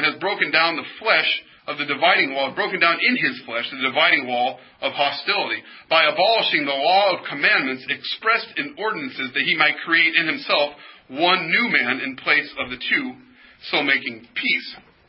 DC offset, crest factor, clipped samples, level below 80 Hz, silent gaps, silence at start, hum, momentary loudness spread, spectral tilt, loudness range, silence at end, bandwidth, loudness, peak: under 0.1%; 20 dB; under 0.1%; -68 dBFS; none; 0 s; none; 10 LU; -7.5 dB/octave; 2 LU; 0.3 s; 5.8 kHz; -19 LUFS; -2 dBFS